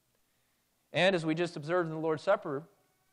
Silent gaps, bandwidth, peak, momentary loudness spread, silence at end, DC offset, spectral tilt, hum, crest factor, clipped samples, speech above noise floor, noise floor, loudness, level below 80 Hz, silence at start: none; 11 kHz; -16 dBFS; 9 LU; 0.5 s; under 0.1%; -5.5 dB/octave; none; 18 dB; under 0.1%; 44 dB; -75 dBFS; -31 LUFS; -82 dBFS; 0.95 s